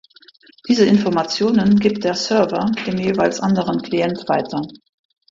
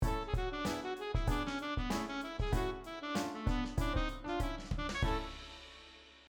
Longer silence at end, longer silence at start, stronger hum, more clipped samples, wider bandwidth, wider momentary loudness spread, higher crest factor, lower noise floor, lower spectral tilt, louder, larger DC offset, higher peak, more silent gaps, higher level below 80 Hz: first, 0.55 s vs 0.05 s; first, 0.65 s vs 0 s; neither; neither; second, 7.6 kHz vs over 20 kHz; second, 7 LU vs 12 LU; about the same, 16 dB vs 16 dB; second, -49 dBFS vs -57 dBFS; about the same, -6 dB/octave vs -5.5 dB/octave; first, -18 LUFS vs -38 LUFS; neither; first, -2 dBFS vs -20 dBFS; neither; second, -54 dBFS vs -42 dBFS